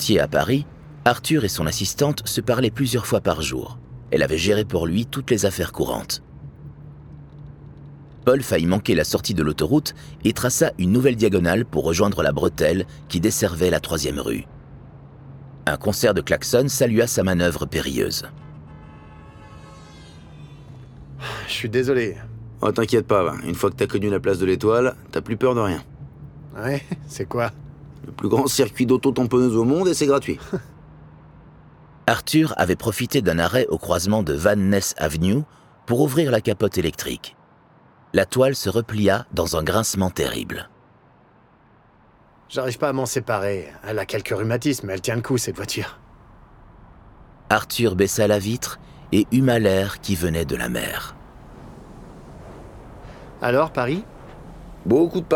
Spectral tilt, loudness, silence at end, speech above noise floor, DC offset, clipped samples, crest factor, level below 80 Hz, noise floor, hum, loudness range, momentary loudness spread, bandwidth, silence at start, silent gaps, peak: -5 dB/octave; -21 LUFS; 0 s; 33 dB; under 0.1%; under 0.1%; 20 dB; -44 dBFS; -54 dBFS; none; 7 LU; 23 LU; 19 kHz; 0 s; none; -2 dBFS